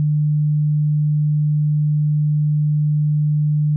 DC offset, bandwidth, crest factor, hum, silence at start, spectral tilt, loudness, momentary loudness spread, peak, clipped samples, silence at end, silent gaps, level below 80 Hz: under 0.1%; 0.2 kHz; 4 dB; none; 0 s; -30.5 dB/octave; -18 LUFS; 0 LU; -14 dBFS; under 0.1%; 0 s; none; -60 dBFS